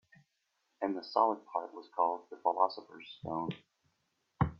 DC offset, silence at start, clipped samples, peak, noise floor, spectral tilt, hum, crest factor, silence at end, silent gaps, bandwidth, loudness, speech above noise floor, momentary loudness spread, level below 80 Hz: under 0.1%; 0.8 s; under 0.1%; -14 dBFS; -81 dBFS; -8.5 dB/octave; none; 22 dB; 0.05 s; none; 6.8 kHz; -35 LUFS; 46 dB; 15 LU; -60 dBFS